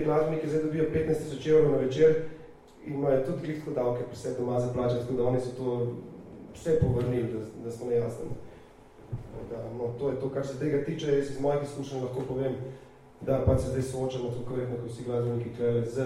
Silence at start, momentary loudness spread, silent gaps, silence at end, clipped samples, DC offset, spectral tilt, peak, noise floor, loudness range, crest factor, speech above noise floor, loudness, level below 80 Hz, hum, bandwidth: 0 s; 14 LU; none; 0 s; under 0.1%; under 0.1%; -7.5 dB/octave; -10 dBFS; -52 dBFS; 6 LU; 18 dB; 23 dB; -29 LUFS; -50 dBFS; none; 12.5 kHz